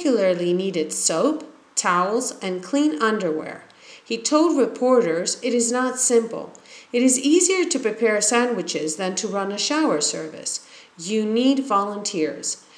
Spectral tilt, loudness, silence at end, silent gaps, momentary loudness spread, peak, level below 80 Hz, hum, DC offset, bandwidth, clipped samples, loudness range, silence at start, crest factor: -3 dB/octave; -21 LUFS; 0.2 s; none; 10 LU; -4 dBFS; -82 dBFS; none; under 0.1%; 11 kHz; under 0.1%; 3 LU; 0 s; 18 dB